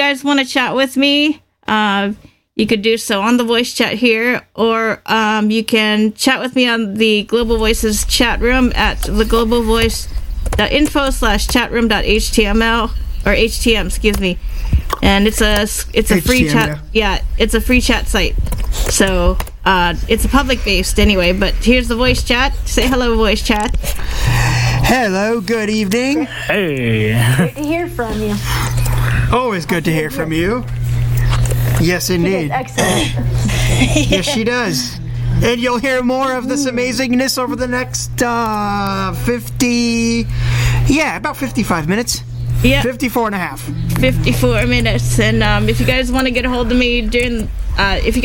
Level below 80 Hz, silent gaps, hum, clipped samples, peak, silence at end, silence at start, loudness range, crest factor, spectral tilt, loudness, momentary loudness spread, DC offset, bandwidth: -22 dBFS; none; none; under 0.1%; 0 dBFS; 0 s; 0 s; 2 LU; 14 dB; -4.5 dB/octave; -15 LUFS; 6 LU; under 0.1%; 17 kHz